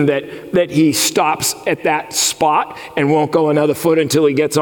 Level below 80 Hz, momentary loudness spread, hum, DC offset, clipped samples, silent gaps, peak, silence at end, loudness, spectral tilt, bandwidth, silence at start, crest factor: -56 dBFS; 5 LU; none; under 0.1%; under 0.1%; none; -4 dBFS; 0 s; -15 LUFS; -4 dB/octave; 18 kHz; 0 s; 12 dB